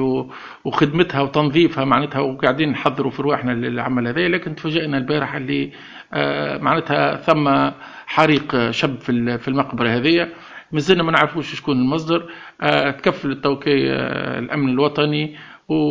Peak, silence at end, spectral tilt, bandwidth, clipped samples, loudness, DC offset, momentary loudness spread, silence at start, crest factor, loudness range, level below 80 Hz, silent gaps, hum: 0 dBFS; 0 s; -6.5 dB/octave; 8 kHz; under 0.1%; -19 LUFS; under 0.1%; 8 LU; 0 s; 18 dB; 2 LU; -54 dBFS; none; none